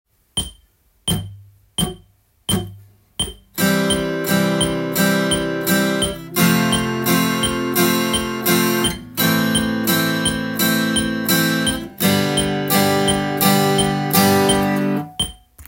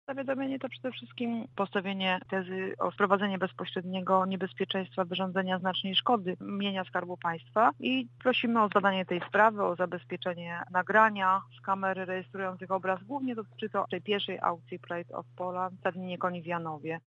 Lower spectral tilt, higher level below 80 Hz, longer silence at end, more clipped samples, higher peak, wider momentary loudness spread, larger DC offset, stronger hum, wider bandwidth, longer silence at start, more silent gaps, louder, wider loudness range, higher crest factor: second, -4 dB/octave vs -7 dB/octave; first, -42 dBFS vs -82 dBFS; about the same, 0.05 s vs 0.1 s; neither; first, -2 dBFS vs -8 dBFS; about the same, 10 LU vs 11 LU; neither; neither; first, 17 kHz vs 7.4 kHz; first, 0.35 s vs 0.1 s; neither; first, -18 LUFS vs -31 LUFS; about the same, 6 LU vs 6 LU; about the same, 18 dB vs 22 dB